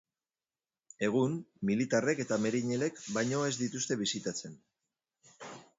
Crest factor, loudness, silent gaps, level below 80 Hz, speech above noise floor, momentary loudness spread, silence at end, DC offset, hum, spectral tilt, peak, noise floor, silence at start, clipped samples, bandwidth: 18 dB; -33 LUFS; none; -74 dBFS; over 58 dB; 12 LU; 0.15 s; under 0.1%; none; -4.5 dB/octave; -16 dBFS; under -90 dBFS; 1 s; under 0.1%; 8 kHz